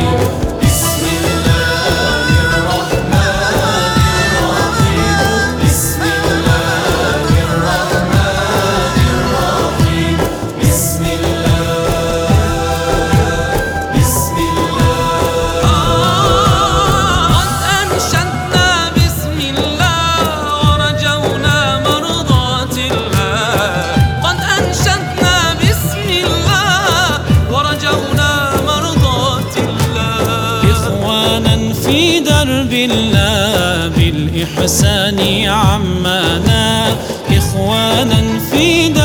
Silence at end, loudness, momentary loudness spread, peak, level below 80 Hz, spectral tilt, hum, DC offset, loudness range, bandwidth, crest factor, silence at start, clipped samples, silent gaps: 0 s; -12 LUFS; 4 LU; 0 dBFS; -24 dBFS; -4.5 dB/octave; none; under 0.1%; 2 LU; over 20 kHz; 12 dB; 0 s; under 0.1%; none